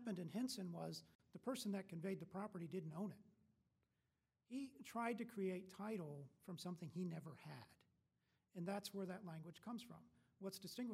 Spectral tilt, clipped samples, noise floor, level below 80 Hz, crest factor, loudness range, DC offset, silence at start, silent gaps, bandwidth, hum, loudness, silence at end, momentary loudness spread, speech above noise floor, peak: -5.5 dB/octave; under 0.1%; -89 dBFS; -90 dBFS; 18 dB; 4 LU; under 0.1%; 0 s; 1.15-1.19 s; 16 kHz; none; -50 LUFS; 0 s; 11 LU; 39 dB; -32 dBFS